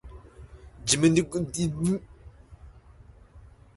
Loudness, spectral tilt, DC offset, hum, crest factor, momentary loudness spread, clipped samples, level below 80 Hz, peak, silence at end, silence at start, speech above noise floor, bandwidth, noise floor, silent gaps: -26 LUFS; -4.5 dB/octave; under 0.1%; none; 22 dB; 19 LU; under 0.1%; -50 dBFS; -8 dBFS; 0.35 s; 0.05 s; 27 dB; 11.5 kHz; -52 dBFS; none